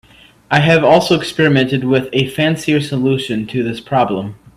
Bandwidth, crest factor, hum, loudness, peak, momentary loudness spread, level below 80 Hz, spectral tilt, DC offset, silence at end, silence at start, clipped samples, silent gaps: 15 kHz; 14 dB; none; -14 LUFS; 0 dBFS; 8 LU; -48 dBFS; -6 dB/octave; under 0.1%; 0.2 s; 0.5 s; under 0.1%; none